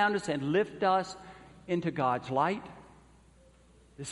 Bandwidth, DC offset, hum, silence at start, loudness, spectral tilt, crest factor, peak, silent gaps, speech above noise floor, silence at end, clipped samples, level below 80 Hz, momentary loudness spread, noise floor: 11.5 kHz; under 0.1%; none; 0 s; -31 LUFS; -5.5 dB/octave; 18 dB; -14 dBFS; none; 30 dB; 0 s; under 0.1%; -64 dBFS; 20 LU; -60 dBFS